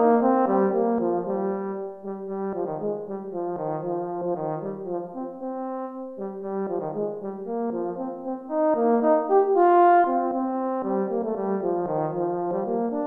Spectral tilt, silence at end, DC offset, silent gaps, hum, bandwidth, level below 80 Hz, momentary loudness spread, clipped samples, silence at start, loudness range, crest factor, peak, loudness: -11 dB/octave; 0 s; under 0.1%; none; none; 3.7 kHz; -68 dBFS; 13 LU; under 0.1%; 0 s; 9 LU; 16 dB; -8 dBFS; -25 LUFS